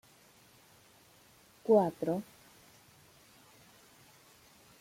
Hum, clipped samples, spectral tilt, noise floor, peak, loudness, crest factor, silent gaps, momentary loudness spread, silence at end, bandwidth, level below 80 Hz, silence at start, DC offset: none; under 0.1%; -7 dB/octave; -62 dBFS; -14 dBFS; -31 LUFS; 24 dB; none; 17 LU; 2.6 s; 16.5 kHz; -76 dBFS; 1.65 s; under 0.1%